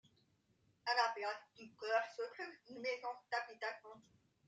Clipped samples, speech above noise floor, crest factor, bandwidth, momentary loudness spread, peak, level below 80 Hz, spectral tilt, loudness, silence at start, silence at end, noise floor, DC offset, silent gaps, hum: under 0.1%; 35 dB; 22 dB; 9.2 kHz; 14 LU; -22 dBFS; under -90 dBFS; -1.5 dB/octave; -42 LUFS; 0.85 s; 0.45 s; -77 dBFS; under 0.1%; none; none